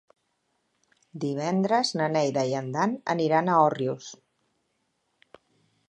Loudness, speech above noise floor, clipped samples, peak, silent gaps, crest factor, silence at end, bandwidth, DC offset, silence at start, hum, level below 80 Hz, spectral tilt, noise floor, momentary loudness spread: -25 LUFS; 50 dB; under 0.1%; -8 dBFS; none; 20 dB; 1.75 s; 10.5 kHz; under 0.1%; 1.15 s; none; -78 dBFS; -5.5 dB/octave; -75 dBFS; 12 LU